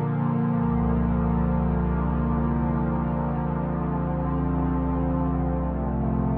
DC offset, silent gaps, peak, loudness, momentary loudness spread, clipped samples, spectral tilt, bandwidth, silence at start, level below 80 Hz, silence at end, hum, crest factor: under 0.1%; none; -12 dBFS; -25 LUFS; 3 LU; under 0.1%; -10.5 dB/octave; 3.5 kHz; 0 s; -30 dBFS; 0 s; none; 12 dB